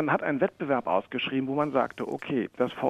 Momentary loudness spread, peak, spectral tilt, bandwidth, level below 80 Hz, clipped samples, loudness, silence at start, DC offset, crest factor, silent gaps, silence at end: 4 LU; -10 dBFS; -7.5 dB/octave; 9.4 kHz; -68 dBFS; under 0.1%; -28 LUFS; 0 s; under 0.1%; 18 dB; none; 0 s